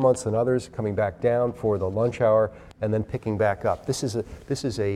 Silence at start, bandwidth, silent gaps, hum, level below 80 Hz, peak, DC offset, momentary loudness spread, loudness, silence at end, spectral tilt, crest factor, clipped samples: 0 s; 13.5 kHz; none; none; -50 dBFS; -8 dBFS; under 0.1%; 8 LU; -25 LUFS; 0 s; -6.5 dB/octave; 16 dB; under 0.1%